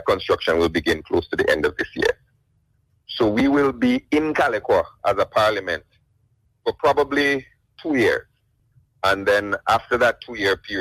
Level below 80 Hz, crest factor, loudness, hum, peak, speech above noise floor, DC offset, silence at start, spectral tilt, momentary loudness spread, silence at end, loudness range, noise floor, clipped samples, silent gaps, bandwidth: -48 dBFS; 16 dB; -21 LUFS; none; -4 dBFS; 45 dB; under 0.1%; 0 s; -5 dB/octave; 7 LU; 0 s; 2 LU; -65 dBFS; under 0.1%; none; 15.5 kHz